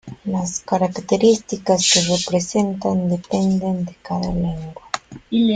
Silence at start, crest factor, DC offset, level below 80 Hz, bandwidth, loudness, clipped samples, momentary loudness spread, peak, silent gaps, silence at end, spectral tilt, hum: 0.05 s; 18 dB; under 0.1%; -44 dBFS; 9.6 kHz; -20 LUFS; under 0.1%; 11 LU; -2 dBFS; none; 0 s; -4.5 dB/octave; none